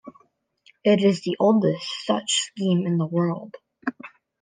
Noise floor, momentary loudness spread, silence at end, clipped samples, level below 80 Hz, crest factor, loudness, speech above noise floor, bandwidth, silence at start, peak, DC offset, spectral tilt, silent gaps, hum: -62 dBFS; 13 LU; 0.35 s; under 0.1%; -72 dBFS; 16 dB; -23 LUFS; 41 dB; 10 kHz; 0.05 s; -8 dBFS; under 0.1%; -5 dB/octave; none; none